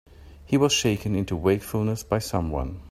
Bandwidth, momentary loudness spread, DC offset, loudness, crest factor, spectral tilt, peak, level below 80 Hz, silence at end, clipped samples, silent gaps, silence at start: 16 kHz; 7 LU; under 0.1%; -25 LUFS; 18 dB; -5 dB/octave; -8 dBFS; -42 dBFS; 0 s; under 0.1%; none; 0.1 s